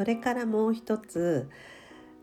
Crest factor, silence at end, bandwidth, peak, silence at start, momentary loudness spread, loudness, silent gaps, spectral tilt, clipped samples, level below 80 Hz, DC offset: 16 dB; 0.1 s; 14 kHz; -14 dBFS; 0 s; 21 LU; -29 LUFS; none; -6.5 dB/octave; under 0.1%; -66 dBFS; under 0.1%